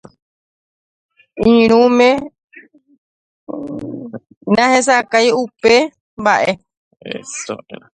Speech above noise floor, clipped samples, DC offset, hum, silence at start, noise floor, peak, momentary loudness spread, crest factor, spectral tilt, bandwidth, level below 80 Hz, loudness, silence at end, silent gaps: 31 dB; under 0.1%; under 0.1%; none; 1.35 s; -45 dBFS; 0 dBFS; 19 LU; 16 dB; -4 dB/octave; 9.6 kHz; -52 dBFS; -14 LUFS; 0.2 s; 2.44-2.48 s, 2.98-3.47 s, 4.37-4.41 s, 6.01-6.17 s, 6.77-6.91 s